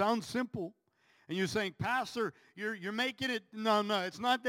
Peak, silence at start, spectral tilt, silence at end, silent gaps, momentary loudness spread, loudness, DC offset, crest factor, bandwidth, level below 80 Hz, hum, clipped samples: -16 dBFS; 0 s; -4.5 dB/octave; 0 s; none; 9 LU; -35 LUFS; under 0.1%; 18 dB; 16.5 kHz; -72 dBFS; none; under 0.1%